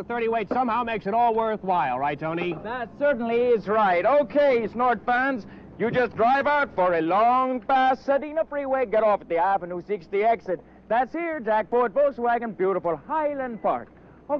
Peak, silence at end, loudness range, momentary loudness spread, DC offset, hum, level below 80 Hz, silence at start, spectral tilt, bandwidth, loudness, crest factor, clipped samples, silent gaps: -12 dBFS; 0 s; 3 LU; 7 LU; under 0.1%; none; -58 dBFS; 0 s; -7.5 dB/octave; 6.4 kHz; -24 LUFS; 12 dB; under 0.1%; none